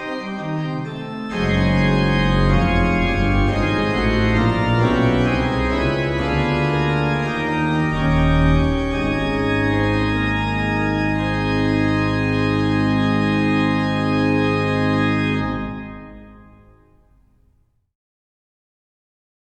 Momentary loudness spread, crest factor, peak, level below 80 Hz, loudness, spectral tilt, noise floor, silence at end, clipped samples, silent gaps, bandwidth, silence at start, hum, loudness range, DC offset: 7 LU; 14 dB; -4 dBFS; -30 dBFS; -19 LUFS; -7.5 dB/octave; -60 dBFS; 3.2 s; under 0.1%; none; 10 kHz; 0 s; none; 4 LU; under 0.1%